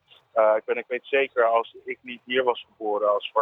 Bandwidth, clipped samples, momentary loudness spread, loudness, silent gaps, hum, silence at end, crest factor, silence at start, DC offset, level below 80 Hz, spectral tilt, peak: 4 kHz; under 0.1%; 13 LU; -24 LUFS; none; none; 0 s; 18 dB; 0.35 s; under 0.1%; -80 dBFS; -5.5 dB/octave; -8 dBFS